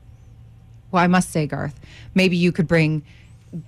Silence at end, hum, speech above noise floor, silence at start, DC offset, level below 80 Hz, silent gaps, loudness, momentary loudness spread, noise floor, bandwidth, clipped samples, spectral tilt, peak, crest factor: 0.05 s; none; 26 dB; 0.9 s; under 0.1%; -48 dBFS; none; -20 LUFS; 12 LU; -45 dBFS; 13 kHz; under 0.1%; -6 dB/octave; -8 dBFS; 14 dB